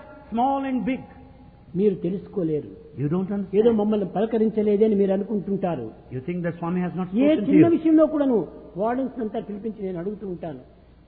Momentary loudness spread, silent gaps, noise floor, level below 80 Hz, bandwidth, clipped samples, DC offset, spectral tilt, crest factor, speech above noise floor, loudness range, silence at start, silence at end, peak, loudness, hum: 14 LU; none; -47 dBFS; -54 dBFS; 4.2 kHz; under 0.1%; under 0.1%; -12.5 dB/octave; 18 dB; 25 dB; 4 LU; 0 s; 0.45 s; -6 dBFS; -23 LUFS; none